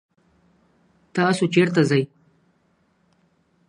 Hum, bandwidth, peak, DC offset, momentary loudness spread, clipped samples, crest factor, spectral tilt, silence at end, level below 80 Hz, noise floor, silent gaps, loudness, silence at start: none; 11 kHz; -4 dBFS; under 0.1%; 11 LU; under 0.1%; 20 dB; -6 dB/octave; 1.65 s; -68 dBFS; -64 dBFS; none; -20 LUFS; 1.15 s